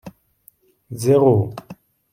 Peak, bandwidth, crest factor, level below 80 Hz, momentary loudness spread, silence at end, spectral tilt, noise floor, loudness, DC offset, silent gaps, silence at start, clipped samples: -2 dBFS; 16 kHz; 18 dB; -60 dBFS; 23 LU; 0.4 s; -8 dB/octave; -56 dBFS; -17 LUFS; under 0.1%; none; 0.05 s; under 0.1%